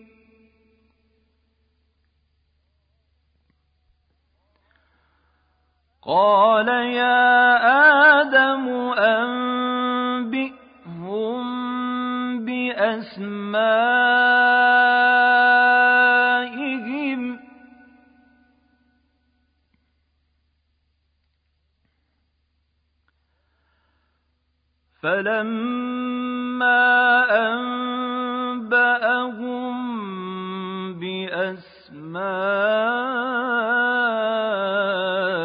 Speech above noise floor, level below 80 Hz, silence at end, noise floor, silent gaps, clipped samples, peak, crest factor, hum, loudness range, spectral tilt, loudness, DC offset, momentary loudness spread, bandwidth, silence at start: 53 dB; -68 dBFS; 0 s; -70 dBFS; none; under 0.1%; -4 dBFS; 18 dB; none; 12 LU; -8.5 dB/octave; -19 LUFS; under 0.1%; 15 LU; 5.2 kHz; 6.05 s